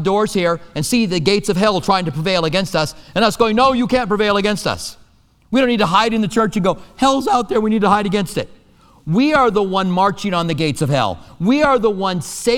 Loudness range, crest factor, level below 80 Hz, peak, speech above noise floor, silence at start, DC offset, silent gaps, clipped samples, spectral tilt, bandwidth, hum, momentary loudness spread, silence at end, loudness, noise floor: 1 LU; 16 dB; -42 dBFS; 0 dBFS; 35 dB; 0 s; under 0.1%; none; under 0.1%; -5 dB/octave; 17 kHz; none; 7 LU; 0 s; -16 LUFS; -51 dBFS